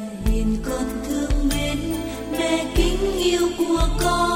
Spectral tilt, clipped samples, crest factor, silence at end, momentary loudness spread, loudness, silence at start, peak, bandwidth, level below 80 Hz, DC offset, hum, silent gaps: -5 dB/octave; under 0.1%; 16 dB; 0 s; 6 LU; -22 LUFS; 0 s; -4 dBFS; 16.5 kHz; -26 dBFS; under 0.1%; none; none